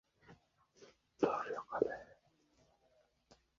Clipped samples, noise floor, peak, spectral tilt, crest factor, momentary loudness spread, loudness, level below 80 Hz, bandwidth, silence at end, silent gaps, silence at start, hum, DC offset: under 0.1%; -75 dBFS; -16 dBFS; -4.5 dB/octave; 28 dB; 13 LU; -39 LUFS; -76 dBFS; 7.4 kHz; 1.45 s; none; 0.3 s; none; under 0.1%